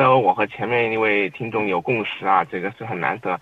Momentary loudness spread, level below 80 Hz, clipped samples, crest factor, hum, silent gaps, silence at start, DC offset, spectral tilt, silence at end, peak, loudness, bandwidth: 7 LU; -62 dBFS; under 0.1%; 18 dB; none; none; 0 s; under 0.1%; -7.5 dB/octave; 0 s; -2 dBFS; -21 LUFS; 7.8 kHz